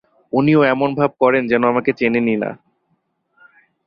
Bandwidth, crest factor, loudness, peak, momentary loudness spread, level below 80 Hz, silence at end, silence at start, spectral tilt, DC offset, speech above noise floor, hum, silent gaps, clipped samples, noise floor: 5.6 kHz; 16 dB; -17 LUFS; -2 dBFS; 8 LU; -58 dBFS; 1.3 s; 0.35 s; -9.5 dB/octave; under 0.1%; 51 dB; none; none; under 0.1%; -67 dBFS